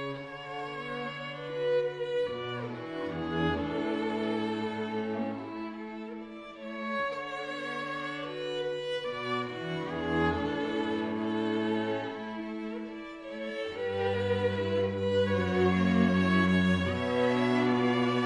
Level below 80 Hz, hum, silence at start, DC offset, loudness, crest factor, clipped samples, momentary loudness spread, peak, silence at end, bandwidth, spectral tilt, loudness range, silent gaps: -52 dBFS; none; 0 s; under 0.1%; -31 LUFS; 18 dB; under 0.1%; 12 LU; -14 dBFS; 0 s; 10.5 kHz; -7 dB/octave; 8 LU; none